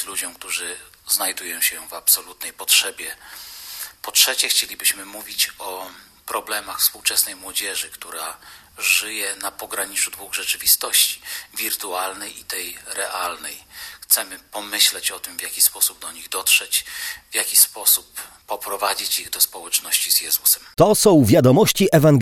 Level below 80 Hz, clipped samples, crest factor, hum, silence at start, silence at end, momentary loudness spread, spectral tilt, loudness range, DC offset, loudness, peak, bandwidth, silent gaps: -54 dBFS; under 0.1%; 20 dB; none; 0 s; 0 s; 17 LU; -2.5 dB/octave; 5 LU; under 0.1%; -18 LUFS; 0 dBFS; 16 kHz; none